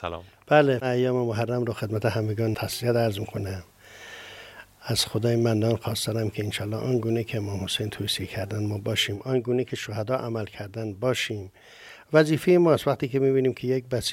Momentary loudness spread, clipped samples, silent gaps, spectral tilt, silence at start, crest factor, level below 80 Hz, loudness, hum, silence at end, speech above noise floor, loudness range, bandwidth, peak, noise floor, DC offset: 17 LU; under 0.1%; none; -5.5 dB/octave; 0 s; 22 dB; -60 dBFS; -25 LUFS; none; 0 s; 21 dB; 4 LU; 16 kHz; -4 dBFS; -46 dBFS; under 0.1%